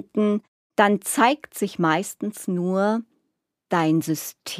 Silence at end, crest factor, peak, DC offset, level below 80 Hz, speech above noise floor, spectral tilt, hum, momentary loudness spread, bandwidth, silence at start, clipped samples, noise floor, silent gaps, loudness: 0 s; 22 dB; -2 dBFS; under 0.1%; -76 dBFS; 55 dB; -5 dB/octave; none; 9 LU; 15.5 kHz; 0.15 s; under 0.1%; -77 dBFS; 0.48-0.70 s; -23 LUFS